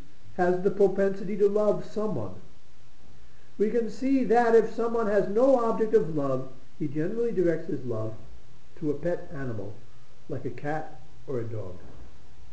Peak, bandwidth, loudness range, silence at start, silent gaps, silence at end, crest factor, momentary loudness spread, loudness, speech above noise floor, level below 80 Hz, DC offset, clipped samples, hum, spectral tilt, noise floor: -10 dBFS; 8.6 kHz; 10 LU; 0.25 s; none; 0.45 s; 18 dB; 16 LU; -27 LUFS; 29 dB; -58 dBFS; 3%; under 0.1%; none; -8 dB/octave; -55 dBFS